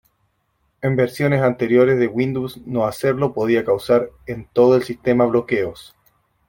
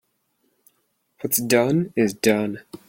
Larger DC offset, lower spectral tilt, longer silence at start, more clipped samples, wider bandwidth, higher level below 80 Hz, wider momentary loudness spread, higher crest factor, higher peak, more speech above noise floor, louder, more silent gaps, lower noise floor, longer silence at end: neither; first, -7.5 dB/octave vs -4.5 dB/octave; second, 0.85 s vs 1.2 s; neither; about the same, 17 kHz vs 17 kHz; first, -54 dBFS vs -62 dBFS; about the same, 10 LU vs 8 LU; about the same, 16 dB vs 20 dB; about the same, -2 dBFS vs -2 dBFS; about the same, 49 dB vs 49 dB; about the same, -19 LUFS vs -21 LUFS; neither; about the same, -67 dBFS vs -70 dBFS; first, 0.65 s vs 0.1 s